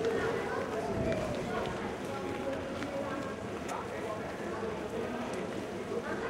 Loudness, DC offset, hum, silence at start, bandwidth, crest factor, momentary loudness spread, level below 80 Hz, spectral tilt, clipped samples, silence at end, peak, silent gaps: -36 LUFS; under 0.1%; none; 0 s; 16 kHz; 16 dB; 5 LU; -56 dBFS; -5.5 dB/octave; under 0.1%; 0 s; -20 dBFS; none